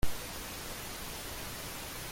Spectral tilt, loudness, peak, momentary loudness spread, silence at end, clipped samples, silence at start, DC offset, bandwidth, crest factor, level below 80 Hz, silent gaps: -2.5 dB/octave; -40 LUFS; -18 dBFS; 0 LU; 0 s; under 0.1%; 0 s; under 0.1%; 17 kHz; 18 dB; -46 dBFS; none